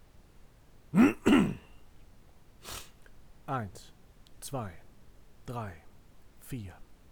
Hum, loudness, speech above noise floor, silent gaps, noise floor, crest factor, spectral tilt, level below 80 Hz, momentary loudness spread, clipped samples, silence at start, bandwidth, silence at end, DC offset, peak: none; -31 LUFS; 16 dB; none; -55 dBFS; 22 dB; -6 dB/octave; -54 dBFS; 25 LU; under 0.1%; 0.45 s; over 20 kHz; 0.2 s; under 0.1%; -10 dBFS